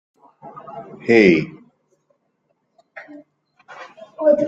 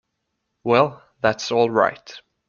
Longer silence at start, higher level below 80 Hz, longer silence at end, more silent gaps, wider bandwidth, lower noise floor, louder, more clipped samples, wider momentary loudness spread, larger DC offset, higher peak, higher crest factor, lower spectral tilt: second, 0.45 s vs 0.65 s; about the same, -60 dBFS vs -60 dBFS; second, 0 s vs 0.3 s; neither; about the same, 7.8 kHz vs 7.2 kHz; second, -69 dBFS vs -76 dBFS; first, -16 LUFS vs -20 LUFS; neither; first, 28 LU vs 16 LU; neither; about the same, -2 dBFS vs -2 dBFS; about the same, 20 dB vs 20 dB; first, -7 dB/octave vs -5 dB/octave